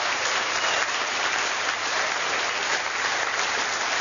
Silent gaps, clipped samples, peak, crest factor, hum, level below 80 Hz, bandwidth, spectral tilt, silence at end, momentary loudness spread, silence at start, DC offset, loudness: none; under 0.1%; -10 dBFS; 16 dB; none; -66 dBFS; 7.4 kHz; 0.5 dB/octave; 0 s; 1 LU; 0 s; under 0.1%; -24 LUFS